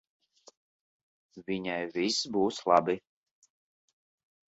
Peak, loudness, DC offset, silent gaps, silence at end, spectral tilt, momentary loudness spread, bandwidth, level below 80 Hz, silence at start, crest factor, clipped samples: -8 dBFS; -30 LUFS; under 0.1%; none; 1.5 s; -4 dB/octave; 11 LU; 8.2 kHz; -72 dBFS; 1.35 s; 26 dB; under 0.1%